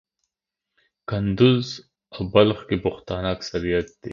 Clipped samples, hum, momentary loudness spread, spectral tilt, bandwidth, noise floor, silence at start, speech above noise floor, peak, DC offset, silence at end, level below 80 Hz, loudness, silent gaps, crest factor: under 0.1%; none; 15 LU; -7 dB/octave; 7.4 kHz; -85 dBFS; 1.1 s; 63 dB; -2 dBFS; under 0.1%; 0 s; -46 dBFS; -22 LUFS; none; 22 dB